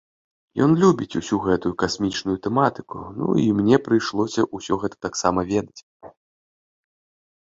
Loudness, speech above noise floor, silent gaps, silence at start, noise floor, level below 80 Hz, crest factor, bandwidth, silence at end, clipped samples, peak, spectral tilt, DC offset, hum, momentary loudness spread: -22 LUFS; over 69 dB; 5.83-6.00 s; 0.55 s; under -90 dBFS; -52 dBFS; 20 dB; 7.8 kHz; 1.3 s; under 0.1%; -2 dBFS; -6 dB/octave; under 0.1%; none; 9 LU